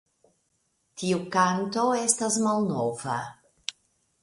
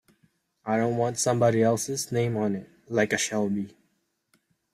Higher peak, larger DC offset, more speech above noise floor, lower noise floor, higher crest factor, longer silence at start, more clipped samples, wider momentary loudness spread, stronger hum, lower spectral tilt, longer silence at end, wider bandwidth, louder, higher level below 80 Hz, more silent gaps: about the same, -6 dBFS vs -8 dBFS; neither; about the same, 47 dB vs 48 dB; about the same, -73 dBFS vs -73 dBFS; about the same, 22 dB vs 18 dB; first, 0.95 s vs 0.65 s; neither; first, 14 LU vs 10 LU; neither; about the same, -4 dB/octave vs -5 dB/octave; second, 0.5 s vs 1.05 s; second, 11.5 kHz vs 15 kHz; about the same, -26 LUFS vs -26 LUFS; about the same, -68 dBFS vs -66 dBFS; neither